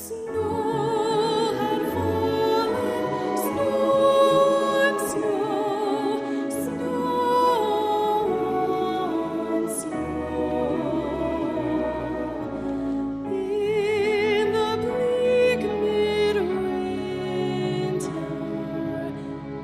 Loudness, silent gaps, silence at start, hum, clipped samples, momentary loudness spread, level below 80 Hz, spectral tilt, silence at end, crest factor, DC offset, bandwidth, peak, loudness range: -24 LUFS; none; 0 s; none; under 0.1%; 9 LU; -52 dBFS; -5.5 dB/octave; 0 s; 16 dB; under 0.1%; 15.5 kHz; -8 dBFS; 5 LU